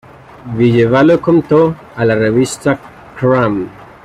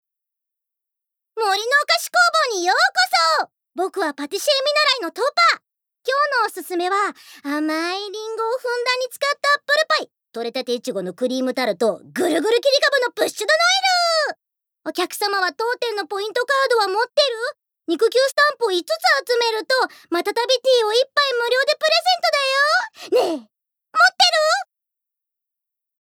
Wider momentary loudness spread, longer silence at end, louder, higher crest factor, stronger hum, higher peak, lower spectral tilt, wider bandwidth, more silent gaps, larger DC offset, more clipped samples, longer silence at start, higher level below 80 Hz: about the same, 11 LU vs 10 LU; second, 0.2 s vs 1.4 s; first, -12 LUFS vs -19 LUFS; second, 12 dB vs 18 dB; neither; about the same, -2 dBFS vs -2 dBFS; first, -7 dB/octave vs -1 dB/octave; second, 13.5 kHz vs 19 kHz; neither; neither; neither; second, 0.45 s vs 1.35 s; first, -46 dBFS vs -88 dBFS